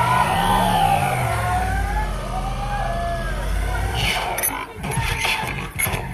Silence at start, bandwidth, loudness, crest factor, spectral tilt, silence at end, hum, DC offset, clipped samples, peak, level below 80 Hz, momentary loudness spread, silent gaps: 0 s; 15.5 kHz; -22 LUFS; 16 dB; -4 dB/octave; 0 s; none; under 0.1%; under 0.1%; -6 dBFS; -28 dBFS; 8 LU; none